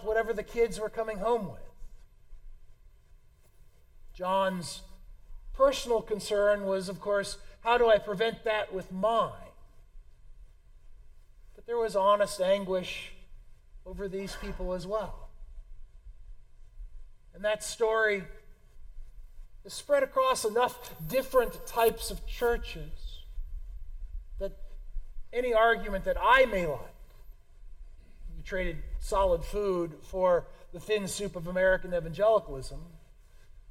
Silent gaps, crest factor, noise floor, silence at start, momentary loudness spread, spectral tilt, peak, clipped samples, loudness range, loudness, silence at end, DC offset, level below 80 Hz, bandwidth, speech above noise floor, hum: none; 22 dB; -57 dBFS; 0 s; 21 LU; -4 dB/octave; -10 dBFS; under 0.1%; 9 LU; -29 LUFS; 0 s; under 0.1%; -44 dBFS; 16.5 kHz; 28 dB; none